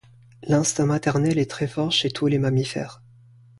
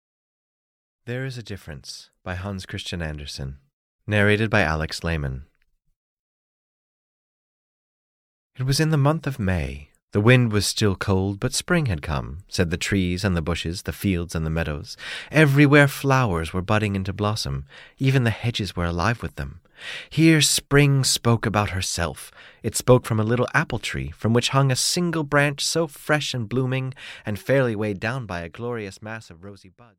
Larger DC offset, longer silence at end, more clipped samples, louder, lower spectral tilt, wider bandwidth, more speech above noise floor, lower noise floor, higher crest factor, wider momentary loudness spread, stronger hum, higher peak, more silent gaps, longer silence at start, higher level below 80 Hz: neither; first, 0.65 s vs 0.3 s; neither; about the same, -22 LUFS vs -22 LUFS; about the same, -5 dB/octave vs -5 dB/octave; second, 11.5 kHz vs 16.5 kHz; second, 29 dB vs over 68 dB; second, -51 dBFS vs under -90 dBFS; about the same, 16 dB vs 20 dB; second, 9 LU vs 16 LU; neither; second, -8 dBFS vs -4 dBFS; second, none vs 3.73-3.99 s, 5.96-8.50 s, 10.02-10.08 s; second, 0.4 s vs 1.05 s; second, -54 dBFS vs -42 dBFS